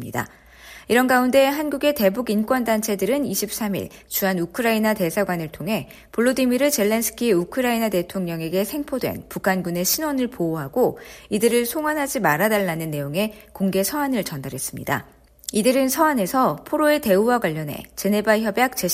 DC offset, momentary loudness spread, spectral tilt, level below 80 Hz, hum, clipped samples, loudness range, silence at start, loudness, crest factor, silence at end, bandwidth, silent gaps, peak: under 0.1%; 9 LU; -4.5 dB/octave; -54 dBFS; none; under 0.1%; 3 LU; 0 s; -21 LUFS; 18 dB; 0 s; 15.5 kHz; none; -4 dBFS